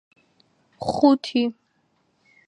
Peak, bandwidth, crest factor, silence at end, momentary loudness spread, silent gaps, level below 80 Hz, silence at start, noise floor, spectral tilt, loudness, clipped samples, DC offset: -4 dBFS; 10 kHz; 20 dB; 0.95 s; 11 LU; none; -62 dBFS; 0.8 s; -68 dBFS; -6 dB/octave; -22 LUFS; under 0.1%; under 0.1%